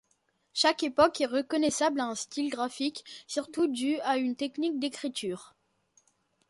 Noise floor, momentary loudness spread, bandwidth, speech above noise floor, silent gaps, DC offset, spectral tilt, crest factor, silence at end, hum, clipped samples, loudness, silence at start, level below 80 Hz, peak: -73 dBFS; 11 LU; 11.5 kHz; 44 dB; none; under 0.1%; -2.5 dB/octave; 22 dB; 1.05 s; none; under 0.1%; -29 LUFS; 0.55 s; -68 dBFS; -8 dBFS